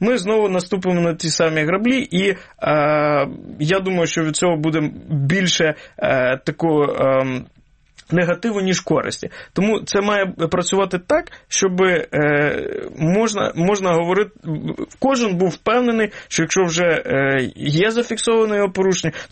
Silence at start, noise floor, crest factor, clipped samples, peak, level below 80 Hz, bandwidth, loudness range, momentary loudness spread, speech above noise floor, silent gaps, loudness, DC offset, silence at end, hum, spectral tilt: 0 s; -50 dBFS; 14 dB; under 0.1%; -4 dBFS; -50 dBFS; 8.8 kHz; 2 LU; 6 LU; 32 dB; none; -18 LUFS; under 0.1%; 0.05 s; none; -4.5 dB/octave